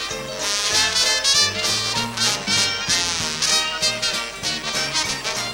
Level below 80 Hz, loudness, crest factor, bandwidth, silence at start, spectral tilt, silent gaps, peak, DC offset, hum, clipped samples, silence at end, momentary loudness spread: -48 dBFS; -19 LUFS; 20 dB; 18 kHz; 0 s; -0.5 dB/octave; none; -2 dBFS; under 0.1%; none; under 0.1%; 0 s; 7 LU